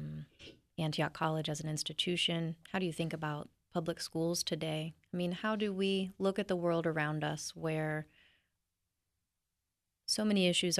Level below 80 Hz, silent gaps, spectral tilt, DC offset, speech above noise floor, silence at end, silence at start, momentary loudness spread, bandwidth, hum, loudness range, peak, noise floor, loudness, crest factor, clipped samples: -70 dBFS; none; -4.5 dB/octave; under 0.1%; 53 dB; 0 s; 0 s; 10 LU; 13.5 kHz; none; 3 LU; -18 dBFS; -88 dBFS; -35 LUFS; 18 dB; under 0.1%